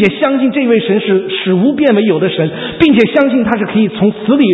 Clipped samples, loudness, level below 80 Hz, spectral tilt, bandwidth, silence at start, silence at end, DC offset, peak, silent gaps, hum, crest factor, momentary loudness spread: 0.1%; -11 LUFS; -46 dBFS; -8.5 dB/octave; 5.4 kHz; 0 s; 0 s; under 0.1%; 0 dBFS; none; none; 10 dB; 5 LU